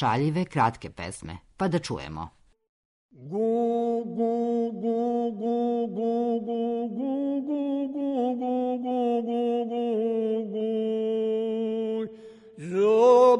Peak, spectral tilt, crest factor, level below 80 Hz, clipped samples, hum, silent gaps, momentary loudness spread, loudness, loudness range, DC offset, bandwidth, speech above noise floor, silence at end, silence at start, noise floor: -8 dBFS; -7 dB/octave; 18 dB; -60 dBFS; under 0.1%; none; 2.69-3.09 s; 10 LU; -27 LUFS; 3 LU; under 0.1%; 10.5 kHz; 22 dB; 0 s; 0 s; -47 dBFS